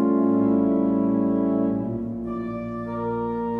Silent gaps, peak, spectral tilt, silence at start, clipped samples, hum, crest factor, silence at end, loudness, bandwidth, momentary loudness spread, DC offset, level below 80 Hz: none; -10 dBFS; -11.5 dB/octave; 0 s; under 0.1%; none; 12 dB; 0 s; -24 LUFS; 3.7 kHz; 9 LU; under 0.1%; -50 dBFS